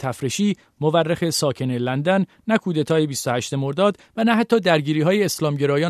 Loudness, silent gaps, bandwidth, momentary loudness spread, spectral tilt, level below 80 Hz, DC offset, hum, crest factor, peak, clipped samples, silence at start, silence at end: -21 LUFS; none; 14 kHz; 5 LU; -5.5 dB/octave; -62 dBFS; under 0.1%; none; 16 dB; -4 dBFS; under 0.1%; 0 s; 0 s